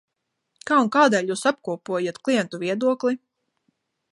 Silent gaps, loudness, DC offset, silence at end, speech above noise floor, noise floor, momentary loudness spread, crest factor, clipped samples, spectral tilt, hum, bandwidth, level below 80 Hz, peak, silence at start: none; -22 LUFS; under 0.1%; 0.95 s; 54 dB; -75 dBFS; 10 LU; 20 dB; under 0.1%; -4.5 dB/octave; none; 11.5 kHz; -76 dBFS; -4 dBFS; 0.65 s